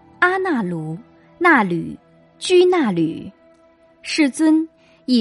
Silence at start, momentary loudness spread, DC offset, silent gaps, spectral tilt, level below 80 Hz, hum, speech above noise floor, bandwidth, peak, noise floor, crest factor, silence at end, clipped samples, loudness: 0.2 s; 19 LU; under 0.1%; none; -5 dB/octave; -62 dBFS; none; 35 dB; 11.5 kHz; -2 dBFS; -53 dBFS; 18 dB; 0 s; under 0.1%; -18 LUFS